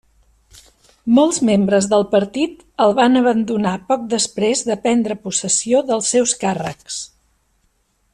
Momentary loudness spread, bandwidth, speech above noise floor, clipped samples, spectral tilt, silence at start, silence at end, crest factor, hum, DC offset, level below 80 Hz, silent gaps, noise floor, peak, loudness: 11 LU; 11 kHz; 47 dB; under 0.1%; -4 dB/octave; 1.05 s; 1.05 s; 14 dB; none; under 0.1%; -56 dBFS; none; -63 dBFS; -2 dBFS; -17 LUFS